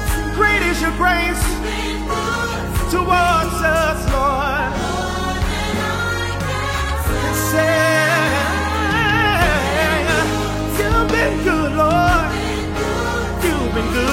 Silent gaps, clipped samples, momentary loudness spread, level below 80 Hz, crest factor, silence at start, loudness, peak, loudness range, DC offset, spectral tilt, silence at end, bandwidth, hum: none; under 0.1%; 7 LU; -26 dBFS; 16 dB; 0 s; -17 LUFS; -2 dBFS; 3 LU; under 0.1%; -4.5 dB/octave; 0 s; 16.5 kHz; none